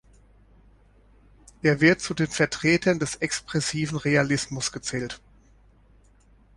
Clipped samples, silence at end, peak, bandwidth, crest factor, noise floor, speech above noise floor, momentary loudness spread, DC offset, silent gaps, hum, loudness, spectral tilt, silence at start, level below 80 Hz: under 0.1%; 1.4 s; -4 dBFS; 11.5 kHz; 22 dB; -57 dBFS; 33 dB; 11 LU; under 0.1%; none; none; -24 LUFS; -4.5 dB/octave; 1.65 s; -54 dBFS